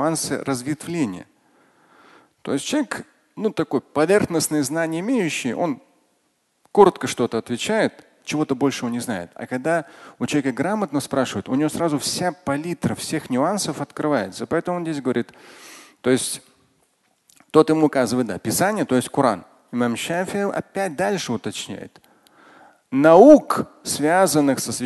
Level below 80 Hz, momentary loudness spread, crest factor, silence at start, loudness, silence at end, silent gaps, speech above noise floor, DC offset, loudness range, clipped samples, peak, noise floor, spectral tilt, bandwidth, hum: -58 dBFS; 12 LU; 22 dB; 0 s; -21 LUFS; 0 s; none; 47 dB; under 0.1%; 8 LU; under 0.1%; 0 dBFS; -68 dBFS; -4.5 dB/octave; 12.5 kHz; none